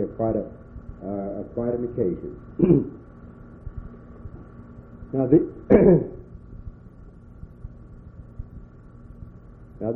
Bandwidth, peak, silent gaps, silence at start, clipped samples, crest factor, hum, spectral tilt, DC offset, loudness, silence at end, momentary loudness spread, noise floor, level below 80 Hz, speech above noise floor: 3 kHz; -4 dBFS; none; 0 s; under 0.1%; 22 dB; none; -13 dB/octave; under 0.1%; -22 LUFS; 0 s; 26 LU; -45 dBFS; -44 dBFS; 24 dB